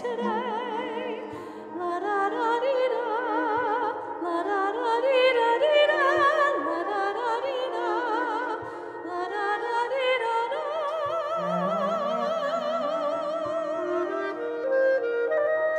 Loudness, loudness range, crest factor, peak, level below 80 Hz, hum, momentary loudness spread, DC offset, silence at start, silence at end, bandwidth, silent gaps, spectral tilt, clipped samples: -26 LUFS; 5 LU; 16 dB; -10 dBFS; -74 dBFS; none; 10 LU; under 0.1%; 0 s; 0 s; 9.6 kHz; none; -5 dB/octave; under 0.1%